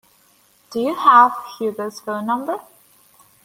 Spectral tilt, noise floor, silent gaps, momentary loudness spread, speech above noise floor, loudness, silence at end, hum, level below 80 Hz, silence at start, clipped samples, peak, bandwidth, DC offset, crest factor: -4.5 dB/octave; -56 dBFS; none; 17 LU; 39 dB; -18 LUFS; 0.85 s; none; -70 dBFS; 0.7 s; under 0.1%; 0 dBFS; 16.5 kHz; under 0.1%; 20 dB